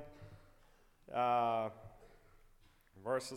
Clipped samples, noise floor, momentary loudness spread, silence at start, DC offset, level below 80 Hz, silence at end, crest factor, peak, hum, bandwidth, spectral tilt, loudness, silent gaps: under 0.1%; -66 dBFS; 25 LU; 0 s; under 0.1%; -66 dBFS; 0 s; 18 dB; -22 dBFS; none; 16 kHz; -5 dB/octave; -37 LUFS; none